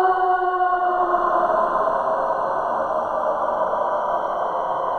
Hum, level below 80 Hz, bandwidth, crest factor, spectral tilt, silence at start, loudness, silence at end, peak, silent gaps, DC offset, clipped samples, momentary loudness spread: none; -52 dBFS; 8.6 kHz; 14 dB; -6 dB/octave; 0 s; -21 LUFS; 0 s; -6 dBFS; none; under 0.1%; under 0.1%; 4 LU